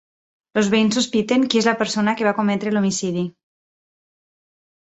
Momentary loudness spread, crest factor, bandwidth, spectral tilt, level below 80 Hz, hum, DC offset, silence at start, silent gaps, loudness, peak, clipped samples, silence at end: 7 LU; 20 dB; 8.2 kHz; -4.5 dB/octave; -62 dBFS; none; under 0.1%; 0.55 s; none; -19 LUFS; -2 dBFS; under 0.1%; 1.55 s